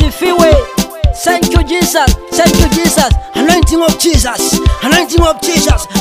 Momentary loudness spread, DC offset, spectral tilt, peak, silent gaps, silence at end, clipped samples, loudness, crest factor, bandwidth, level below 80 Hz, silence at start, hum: 4 LU; 0.2%; -4 dB/octave; 0 dBFS; none; 0 s; 0.4%; -10 LUFS; 10 dB; 16.5 kHz; -16 dBFS; 0 s; none